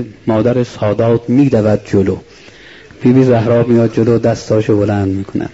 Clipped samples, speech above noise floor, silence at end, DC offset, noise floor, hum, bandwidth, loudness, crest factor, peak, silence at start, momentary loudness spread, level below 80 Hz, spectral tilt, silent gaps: under 0.1%; 26 dB; 0.05 s; 0.2%; -38 dBFS; none; 8 kHz; -13 LUFS; 12 dB; 0 dBFS; 0 s; 6 LU; -44 dBFS; -8.5 dB/octave; none